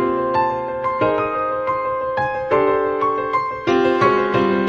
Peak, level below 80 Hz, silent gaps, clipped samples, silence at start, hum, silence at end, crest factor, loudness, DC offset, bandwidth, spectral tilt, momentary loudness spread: -4 dBFS; -48 dBFS; none; under 0.1%; 0 s; none; 0 s; 14 dB; -19 LUFS; under 0.1%; 7 kHz; -7 dB/octave; 5 LU